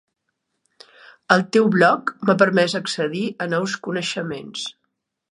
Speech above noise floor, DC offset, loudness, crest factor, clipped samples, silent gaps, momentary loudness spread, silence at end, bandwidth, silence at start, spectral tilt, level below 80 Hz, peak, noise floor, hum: 56 dB; under 0.1%; -20 LUFS; 22 dB; under 0.1%; none; 13 LU; 0.6 s; 11.5 kHz; 1.3 s; -5 dB/octave; -68 dBFS; 0 dBFS; -76 dBFS; none